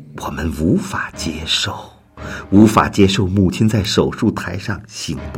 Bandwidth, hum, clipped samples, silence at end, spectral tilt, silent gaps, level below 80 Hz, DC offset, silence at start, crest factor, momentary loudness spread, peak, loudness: 16.5 kHz; none; under 0.1%; 0 s; -5.5 dB/octave; none; -38 dBFS; under 0.1%; 0 s; 16 dB; 14 LU; 0 dBFS; -17 LUFS